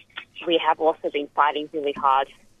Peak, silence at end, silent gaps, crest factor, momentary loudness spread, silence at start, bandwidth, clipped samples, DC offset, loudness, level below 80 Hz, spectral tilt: -4 dBFS; 0.35 s; none; 20 dB; 11 LU; 0.15 s; 10 kHz; under 0.1%; under 0.1%; -23 LUFS; -64 dBFS; -5 dB/octave